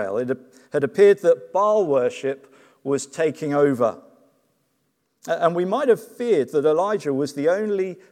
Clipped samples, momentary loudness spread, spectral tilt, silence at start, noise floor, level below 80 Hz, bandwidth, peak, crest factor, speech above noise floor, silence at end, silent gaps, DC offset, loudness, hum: under 0.1%; 11 LU; -6 dB/octave; 0 s; -71 dBFS; -82 dBFS; 14.5 kHz; -4 dBFS; 18 dB; 50 dB; 0.2 s; none; under 0.1%; -21 LUFS; none